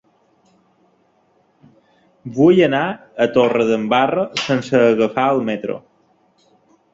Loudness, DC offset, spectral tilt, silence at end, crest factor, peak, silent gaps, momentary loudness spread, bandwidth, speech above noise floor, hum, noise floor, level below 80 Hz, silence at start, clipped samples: -16 LUFS; under 0.1%; -6 dB/octave; 1.15 s; 16 dB; -2 dBFS; none; 12 LU; 7.8 kHz; 43 dB; none; -59 dBFS; -60 dBFS; 2.25 s; under 0.1%